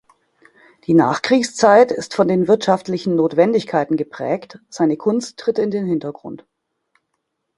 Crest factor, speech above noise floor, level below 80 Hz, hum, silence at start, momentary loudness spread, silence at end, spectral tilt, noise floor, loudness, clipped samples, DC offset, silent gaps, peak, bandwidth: 18 dB; 57 dB; -62 dBFS; none; 0.9 s; 13 LU; 1.2 s; -5.5 dB/octave; -74 dBFS; -17 LUFS; under 0.1%; under 0.1%; none; 0 dBFS; 11.5 kHz